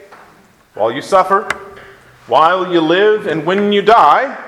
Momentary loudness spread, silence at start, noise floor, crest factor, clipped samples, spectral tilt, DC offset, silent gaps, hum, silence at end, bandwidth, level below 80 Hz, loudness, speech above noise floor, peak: 10 LU; 0.1 s; -47 dBFS; 14 dB; 0.2%; -5 dB/octave; under 0.1%; none; none; 0 s; 13 kHz; -54 dBFS; -12 LUFS; 35 dB; 0 dBFS